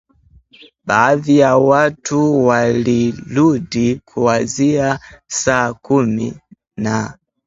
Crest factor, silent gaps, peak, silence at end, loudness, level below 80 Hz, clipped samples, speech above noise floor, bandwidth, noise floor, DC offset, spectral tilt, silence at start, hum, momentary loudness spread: 16 dB; none; 0 dBFS; 0.35 s; -15 LUFS; -48 dBFS; under 0.1%; 35 dB; 8 kHz; -50 dBFS; under 0.1%; -5.5 dB/octave; 0.85 s; none; 11 LU